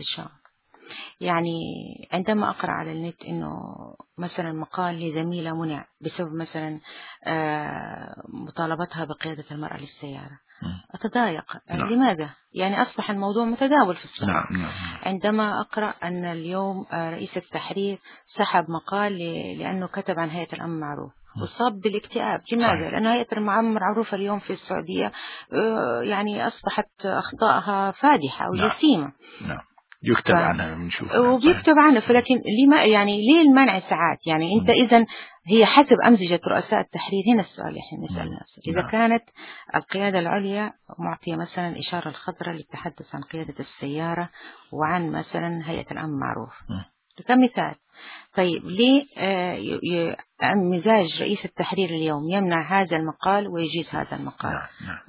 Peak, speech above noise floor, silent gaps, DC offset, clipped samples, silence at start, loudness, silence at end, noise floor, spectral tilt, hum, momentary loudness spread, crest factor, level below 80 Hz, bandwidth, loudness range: -2 dBFS; 27 dB; none; under 0.1%; under 0.1%; 0 s; -23 LUFS; 0.05 s; -50 dBFS; -10 dB/octave; none; 17 LU; 22 dB; -54 dBFS; 4 kHz; 13 LU